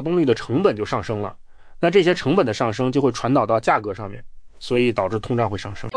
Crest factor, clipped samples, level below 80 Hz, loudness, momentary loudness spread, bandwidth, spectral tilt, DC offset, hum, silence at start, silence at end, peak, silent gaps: 16 dB; under 0.1%; -46 dBFS; -20 LUFS; 12 LU; 10.5 kHz; -6.5 dB/octave; under 0.1%; none; 0 s; 0 s; -4 dBFS; none